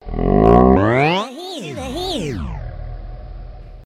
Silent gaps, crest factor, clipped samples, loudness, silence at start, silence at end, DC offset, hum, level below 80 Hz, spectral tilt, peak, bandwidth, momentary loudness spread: none; 18 dB; under 0.1%; -16 LUFS; 0.05 s; 0 s; under 0.1%; none; -28 dBFS; -7 dB/octave; 0 dBFS; 13.5 kHz; 24 LU